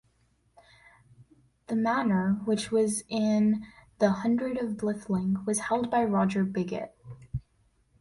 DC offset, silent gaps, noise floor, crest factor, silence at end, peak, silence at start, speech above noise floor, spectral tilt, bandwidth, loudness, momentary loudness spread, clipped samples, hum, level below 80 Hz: under 0.1%; none; -68 dBFS; 18 dB; 0.6 s; -10 dBFS; 1.7 s; 42 dB; -6 dB/octave; 11.5 kHz; -28 LUFS; 14 LU; under 0.1%; none; -58 dBFS